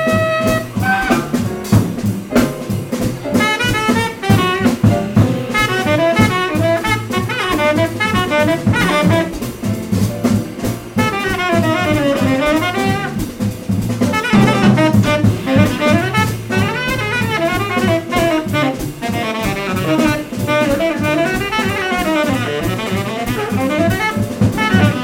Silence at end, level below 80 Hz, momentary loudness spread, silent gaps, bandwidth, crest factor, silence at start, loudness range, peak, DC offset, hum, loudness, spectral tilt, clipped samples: 0 s; -36 dBFS; 7 LU; none; 16.5 kHz; 14 dB; 0 s; 3 LU; 0 dBFS; under 0.1%; none; -15 LUFS; -5.5 dB/octave; under 0.1%